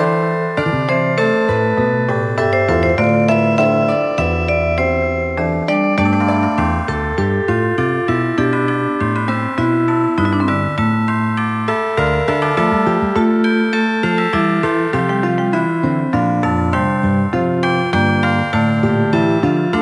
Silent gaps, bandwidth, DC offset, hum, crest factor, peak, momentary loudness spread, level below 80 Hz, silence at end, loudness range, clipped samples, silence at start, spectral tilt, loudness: none; 11 kHz; under 0.1%; none; 14 dB; -2 dBFS; 3 LU; -36 dBFS; 0 s; 2 LU; under 0.1%; 0 s; -7.5 dB/octave; -16 LUFS